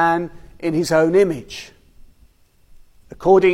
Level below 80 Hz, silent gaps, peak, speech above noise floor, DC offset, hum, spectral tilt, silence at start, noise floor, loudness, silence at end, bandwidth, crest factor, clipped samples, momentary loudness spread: -48 dBFS; none; -2 dBFS; 36 dB; under 0.1%; none; -6 dB/octave; 0 s; -53 dBFS; -18 LUFS; 0 s; 15 kHz; 18 dB; under 0.1%; 18 LU